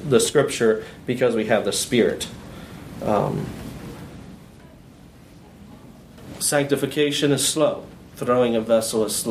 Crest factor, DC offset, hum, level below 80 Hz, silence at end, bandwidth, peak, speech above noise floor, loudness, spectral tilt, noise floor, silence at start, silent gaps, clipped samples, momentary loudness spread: 18 dB; under 0.1%; none; -50 dBFS; 0 s; 15.5 kHz; -4 dBFS; 25 dB; -21 LUFS; -4 dB/octave; -46 dBFS; 0 s; none; under 0.1%; 20 LU